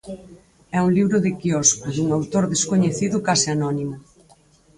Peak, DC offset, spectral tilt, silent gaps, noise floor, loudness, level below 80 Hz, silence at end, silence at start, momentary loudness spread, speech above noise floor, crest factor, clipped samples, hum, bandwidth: -2 dBFS; under 0.1%; -4.5 dB/octave; none; -54 dBFS; -20 LUFS; -54 dBFS; 0.8 s; 0.05 s; 11 LU; 34 dB; 18 dB; under 0.1%; none; 11.5 kHz